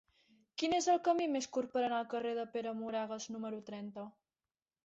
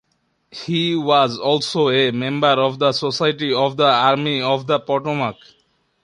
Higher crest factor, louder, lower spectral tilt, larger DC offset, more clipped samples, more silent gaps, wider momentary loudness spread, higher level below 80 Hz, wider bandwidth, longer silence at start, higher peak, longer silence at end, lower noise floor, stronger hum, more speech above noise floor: about the same, 18 dB vs 18 dB; second, -37 LUFS vs -18 LUFS; second, -3 dB/octave vs -5.5 dB/octave; neither; neither; neither; first, 15 LU vs 7 LU; second, -80 dBFS vs -62 dBFS; second, 8 kHz vs 11 kHz; about the same, 0.6 s vs 0.55 s; second, -20 dBFS vs -2 dBFS; about the same, 0.75 s vs 0.7 s; first, under -90 dBFS vs -67 dBFS; neither; first, over 54 dB vs 49 dB